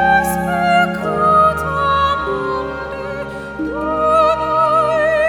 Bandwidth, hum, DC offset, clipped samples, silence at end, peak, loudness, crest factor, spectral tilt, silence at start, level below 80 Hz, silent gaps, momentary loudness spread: 19.5 kHz; none; under 0.1%; under 0.1%; 0 s; -2 dBFS; -16 LUFS; 14 dB; -5.5 dB/octave; 0 s; -38 dBFS; none; 12 LU